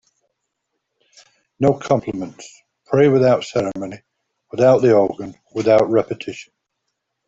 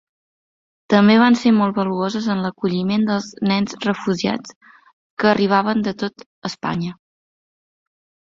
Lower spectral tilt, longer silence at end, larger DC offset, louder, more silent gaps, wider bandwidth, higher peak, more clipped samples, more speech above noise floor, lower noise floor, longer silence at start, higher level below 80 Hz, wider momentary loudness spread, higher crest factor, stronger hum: about the same, -7 dB/octave vs -6 dB/octave; second, 0.85 s vs 1.4 s; neither; about the same, -17 LUFS vs -19 LUFS; second, none vs 4.56-4.61 s, 4.93-5.17 s, 6.26-6.42 s; about the same, 7.8 kHz vs 7.6 kHz; about the same, -2 dBFS vs -2 dBFS; neither; second, 59 dB vs over 72 dB; second, -76 dBFS vs under -90 dBFS; first, 1.6 s vs 0.9 s; about the same, -56 dBFS vs -60 dBFS; first, 18 LU vs 14 LU; about the same, 16 dB vs 18 dB; neither